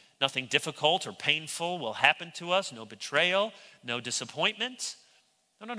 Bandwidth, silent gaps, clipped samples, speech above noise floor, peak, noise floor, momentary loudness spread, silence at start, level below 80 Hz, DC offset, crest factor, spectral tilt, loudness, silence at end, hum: 11 kHz; none; under 0.1%; 37 dB; -4 dBFS; -67 dBFS; 13 LU; 0.2 s; -80 dBFS; under 0.1%; 26 dB; -2 dB/octave; -29 LUFS; 0 s; none